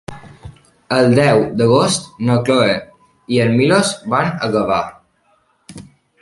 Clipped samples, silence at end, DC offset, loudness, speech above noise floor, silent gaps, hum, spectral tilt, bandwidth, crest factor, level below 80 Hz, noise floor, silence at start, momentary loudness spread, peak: under 0.1%; 0.4 s; under 0.1%; -15 LUFS; 45 dB; none; none; -5.5 dB/octave; 11.5 kHz; 16 dB; -50 dBFS; -59 dBFS; 0.1 s; 8 LU; 0 dBFS